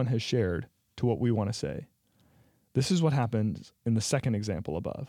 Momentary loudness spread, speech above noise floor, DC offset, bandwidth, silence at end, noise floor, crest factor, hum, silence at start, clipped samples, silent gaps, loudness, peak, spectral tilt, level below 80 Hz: 10 LU; 36 dB; under 0.1%; 13.5 kHz; 0 s; -65 dBFS; 16 dB; none; 0 s; under 0.1%; none; -30 LUFS; -14 dBFS; -6 dB/octave; -60 dBFS